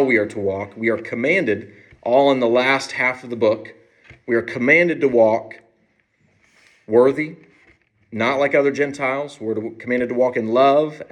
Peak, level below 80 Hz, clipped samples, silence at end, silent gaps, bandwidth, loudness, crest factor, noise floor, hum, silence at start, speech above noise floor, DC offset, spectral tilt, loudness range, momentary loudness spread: -2 dBFS; -66 dBFS; under 0.1%; 0.05 s; none; 10.5 kHz; -19 LUFS; 18 dB; -63 dBFS; none; 0 s; 45 dB; under 0.1%; -5.5 dB/octave; 3 LU; 11 LU